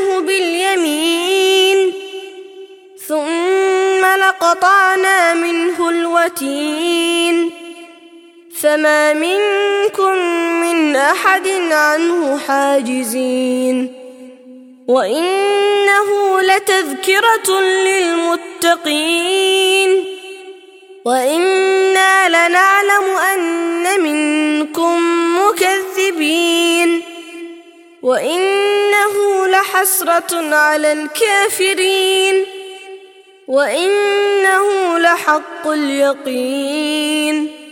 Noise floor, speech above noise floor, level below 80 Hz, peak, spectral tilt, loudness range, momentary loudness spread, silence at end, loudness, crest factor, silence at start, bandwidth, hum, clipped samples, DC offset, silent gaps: -42 dBFS; 28 dB; -68 dBFS; 0 dBFS; -0.5 dB/octave; 3 LU; 8 LU; 0 s; -13 LUFS; 14 dB; 0 s; 17 kHz; none; under 0.1%; under 0.1%; none